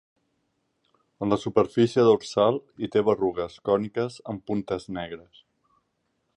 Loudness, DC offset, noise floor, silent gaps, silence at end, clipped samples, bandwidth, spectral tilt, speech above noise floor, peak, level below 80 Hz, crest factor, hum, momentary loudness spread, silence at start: -25 LUFS; under 0.1%; -75 dBFS; none; 1.2 s; under 0.1%; 10.5 kHz; -6.5 dB/octave; 50 dB; -6 dBFS; -60 dBFS; 20 dB; none; 14 LU; 1.2 s